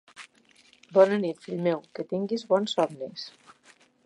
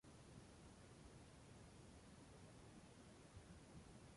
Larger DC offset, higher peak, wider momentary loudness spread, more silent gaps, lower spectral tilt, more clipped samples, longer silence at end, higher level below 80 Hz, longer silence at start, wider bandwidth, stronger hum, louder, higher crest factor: neither; first, -8 dBFS vs -50 dBFS; first, 19 LU vs 1 LU; neither; about the same, -6 dB/octave vs -5 dB/octave; neither; first, 0.75 s vs 0 s; second, -80 dBFS vs -72 dBFS; first, 0.2 s vs 0.05 s; about the same, 11 kHz vs 11.5 kHz; neither; first, -27 LUFS vs -64 LUFS; first, 22 dB vs 14 dB